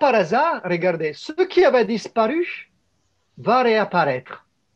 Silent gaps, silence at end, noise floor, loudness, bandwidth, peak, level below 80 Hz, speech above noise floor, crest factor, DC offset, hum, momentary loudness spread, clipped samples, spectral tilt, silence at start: none; 0.4 s; -68 dBFS; -20 LUFS; 8.2 kHz; -4 dBFS; -66 dBFS; 49 dB; 16 dB; under 0.1%; none; 11 LU; under 0.1%; -6 dB/octave; 0 s